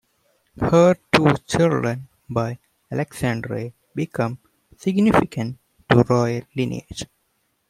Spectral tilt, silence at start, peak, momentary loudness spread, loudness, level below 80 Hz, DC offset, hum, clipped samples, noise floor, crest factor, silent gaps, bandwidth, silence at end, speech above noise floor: -6.5 dB/octave; 0.55 s; 0 dBFS; 16 LU; -21 LUFS; -50 dBFS; under 0.1%; none; under 0.1%; -69 dBFS; 22 dB; none; 15 kHz; 0.65 s; 49 dB